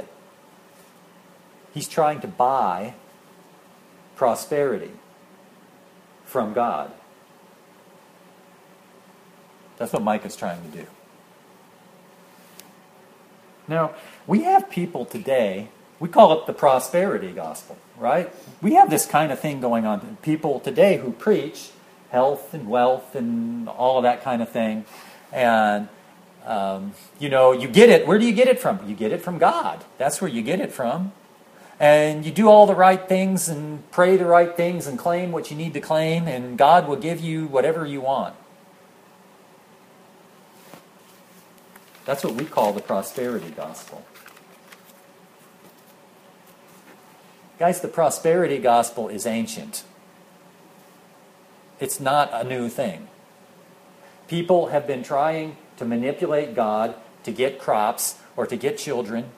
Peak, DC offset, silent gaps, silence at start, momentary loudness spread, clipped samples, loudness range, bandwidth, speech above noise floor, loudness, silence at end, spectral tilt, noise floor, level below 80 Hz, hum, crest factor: 0 dBFS; under 0.1%; none; 0 s; 17 LU; under 0.1%; 14 LU; 15.5 kHz; 31 dB; -21 LUFS; 0.05 s; -5 dB/octave; -51 dBFS; -70 dBFS; none; 22 dB